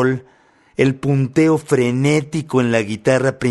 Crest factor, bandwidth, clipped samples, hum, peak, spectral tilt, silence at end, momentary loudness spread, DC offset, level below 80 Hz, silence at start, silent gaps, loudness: 16 dB; 12 kHz; under 0.1%; none; -2 dBFS; -6.5 dB/octave; 0 s; 5 LU; under 0.1%; -52 dBFS; 0 s; none; -17 LUFS